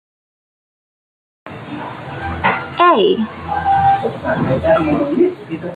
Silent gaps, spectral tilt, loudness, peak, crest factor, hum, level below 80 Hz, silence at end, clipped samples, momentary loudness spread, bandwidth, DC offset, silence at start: none; -8 dB/octave; -16 LUFS; -2 dBFS; 16 dB; none; -46 dBFS; 0 s; under 0.1%; 15 LU; 8.6 kHz; under 0.1%; 1.45 s